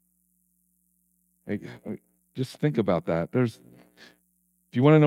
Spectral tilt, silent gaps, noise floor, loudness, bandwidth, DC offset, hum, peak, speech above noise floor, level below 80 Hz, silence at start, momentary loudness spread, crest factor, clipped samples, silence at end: -8.5 dB/octave; none; -70 dBFS; -27 LUFS; 12 kHz; under 0.1%; 60 Hz at -55 dBFS; -8 dBFS; 47 dB; -64 dBFS; 1.45 s; 17 LU; 20 dB; under 0.1%; 0 s